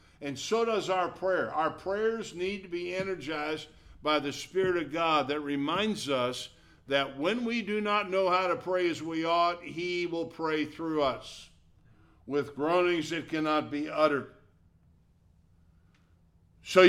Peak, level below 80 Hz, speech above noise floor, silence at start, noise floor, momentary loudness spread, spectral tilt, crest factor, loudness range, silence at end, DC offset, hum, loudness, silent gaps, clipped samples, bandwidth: -8 dBFS; -64 dBFS; 33 dB; 0.2 s; -63 dBFS; 8 LU; -4.5 dB/octave; 22 dB; 3 LU; 0 s; under 0.1%; none; -30 LUFS; none; under 0.1%; 14 kHz